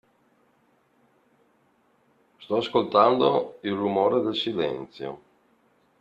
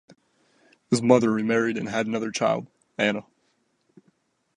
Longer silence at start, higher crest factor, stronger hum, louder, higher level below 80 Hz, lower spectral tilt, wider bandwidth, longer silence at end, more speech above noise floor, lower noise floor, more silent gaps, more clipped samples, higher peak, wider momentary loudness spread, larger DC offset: first, 2.4 s vs 0.9 s; about the same, 22 dB vs 22 dB; neither; about the same, -24 LUFS vs -24 LUFS; about the same, -68 dBFS vs -70 dBFS; first, -7 dB/octave vs -5 dB/octave; second, 7.8 kHz vs 11 kHz; second, 0.85 s vs 1.35 s; second, 41 dB vs 47 dB; second, -65 dBFS vs -70 dBFS; neither; neither; about the same, -6 dBFS vs -4 dBFS; first, 17 LU vs 9 LU; neither